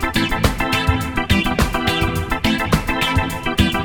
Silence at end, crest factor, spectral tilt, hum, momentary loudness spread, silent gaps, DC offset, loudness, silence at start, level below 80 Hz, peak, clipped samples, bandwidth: 0 s; 18 dB; -5 dB/octave; none; 3 LU; none; 0.2%; -18 LUFS; 0 s; -26 dBFS; 0 dBFS; under 0.1%; 19 kHz